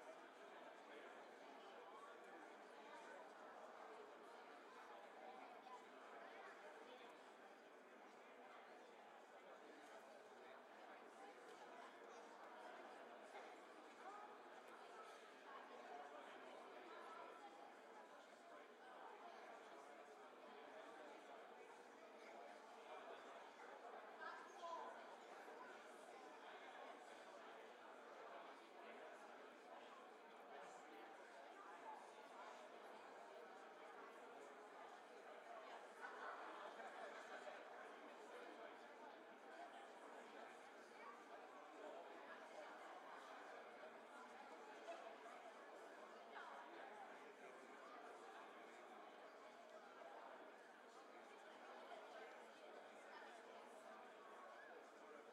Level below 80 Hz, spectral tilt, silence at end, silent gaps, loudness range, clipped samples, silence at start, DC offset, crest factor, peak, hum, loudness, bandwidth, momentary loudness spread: under -90 dBFS; -2.5 dB/octave; 0 s; none; 4 LU; under 0.1%; 0 s; under 0.1%; 18 dB; -42 dBFS; none; -60 LUFS; 12 kHz; 5 LU